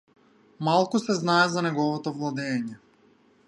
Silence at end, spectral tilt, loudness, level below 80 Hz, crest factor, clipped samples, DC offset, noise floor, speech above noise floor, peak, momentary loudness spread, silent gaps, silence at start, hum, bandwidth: 0.7 s; -5 dB/octave; -25 LUFS; -74 dBFS; 20 dB; under 0.1%; under 0.1%; -60 dBFS; 35 dB; -8 dBFS; 9 LU; none; 0.6 s; none; 11.5 kHz